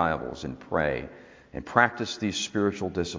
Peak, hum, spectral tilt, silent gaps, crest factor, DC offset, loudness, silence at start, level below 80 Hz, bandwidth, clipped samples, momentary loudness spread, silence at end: -2 dBFS; none; -4.5 dB/octave; none; 26 dB; under 0.1%; -27 LUFS; 0 s; -50 dBFS; 7.6 kHz; under 0.1%; 16 LU; 0 s